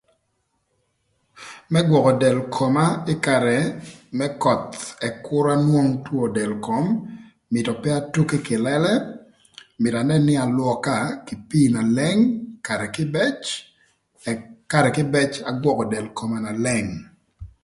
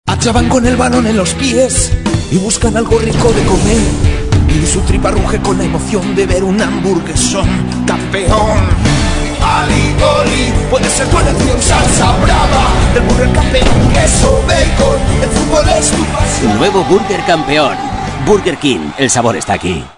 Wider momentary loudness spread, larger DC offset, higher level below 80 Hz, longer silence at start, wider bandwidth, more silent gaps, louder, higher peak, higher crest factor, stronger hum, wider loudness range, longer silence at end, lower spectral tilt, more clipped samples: first, 11 LU vs 4 LU; second, under 0.1% vs 0.7%; second, -56 dBFS vs -18 dBFS; first, 1.35 s vs 0.05 s; about the same, 11.5 kHz vs 11 kHz; neither; second, -21 LUFS vs -11 LUFS; about the same, -2 dBFS vs 0 dBFS; first, 20 dB vs 10 dB; neither; about the same, 3 LU vs 3 LU; first, 0.2 s vs 0.05 s; first, -6 dB/octave vs -4.5 dB/octave; second, under 0.1% vs 0.3%